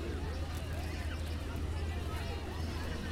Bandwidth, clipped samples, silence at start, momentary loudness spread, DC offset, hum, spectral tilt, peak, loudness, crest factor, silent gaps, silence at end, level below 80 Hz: 15.5 kHz; under 0.1%; 0 s; 1 LU; under 0.1%; none; -6 dB/octave; -26 dBFS; -39 LUFS; 12 dB; none; 0 s; -40 dBFS